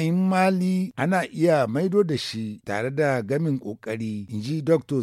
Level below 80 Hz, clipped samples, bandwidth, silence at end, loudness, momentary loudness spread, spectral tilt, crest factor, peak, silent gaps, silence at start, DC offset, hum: -66 dBFS; under 0.1%; 14 kHz; 0 s; -24 LUFS; 10 LU; -7 dB/octave; 14 dB; -8 dBFS; none; 0 s; under 0.1%; none